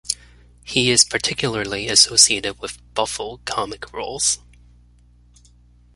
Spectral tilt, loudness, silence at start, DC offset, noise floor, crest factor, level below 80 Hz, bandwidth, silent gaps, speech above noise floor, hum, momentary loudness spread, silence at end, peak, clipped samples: -1 dB/octave; -18 LUFS; 0.05 s; under 0.1%; -52 dBFS; 22 dB; -48 dBFS; 16 kHz; none; 32 dB; 60 Hz at -45 dBFS; 15 LU; 1.6 s; 0 dBFS; under 0.1%